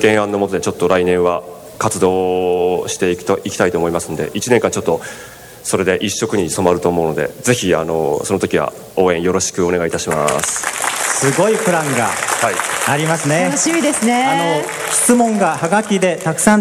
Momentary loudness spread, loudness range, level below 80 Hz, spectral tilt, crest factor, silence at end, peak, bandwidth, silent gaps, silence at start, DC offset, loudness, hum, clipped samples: 5 LU; 3 LU; -48 dBFS; -4 dB/octave; 16 dB; 0 s; 0 dBFS; 20 kHz; none; 0 s; under 0.1%; -16 LUFS; none; under 0.1%